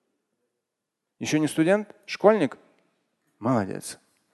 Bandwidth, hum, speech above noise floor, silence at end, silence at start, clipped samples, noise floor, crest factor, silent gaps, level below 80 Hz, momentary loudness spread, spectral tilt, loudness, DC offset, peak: 12.5 kHz; none; 60 dB; 0.4 s; 1.2 s; under 0.1%; -84 dBFS; 24 dB; none; -68 dBFS; 15 LU; -5.5 dB/octave; -25 LUFS; under 0.1%; -4 dBFS